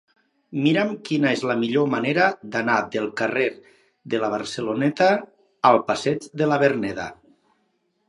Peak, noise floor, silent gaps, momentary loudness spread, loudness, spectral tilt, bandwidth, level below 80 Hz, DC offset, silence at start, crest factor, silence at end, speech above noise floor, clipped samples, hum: -2 dBFS; -69 dBFS; none; 8 LU; -22 LUFS; -5.5 dB/octave; 11 kHz; -64 dBFS; under 0.1%; 0.5 s; 22 dB; 0.95 s; 48 dB; under 0.1%; none